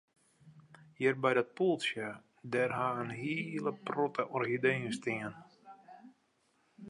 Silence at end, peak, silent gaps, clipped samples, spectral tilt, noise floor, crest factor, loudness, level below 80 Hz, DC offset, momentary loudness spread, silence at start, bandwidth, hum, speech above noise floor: 0 s; -14 dBFS; none; under 0.1%; -5.5 dB/octave; -74 dBFS; 20 dB; -34 LUFS; -78 dBFS; under 0.1%; 13 LU; 0.45 s; 11.5 kHz; none; 40 dB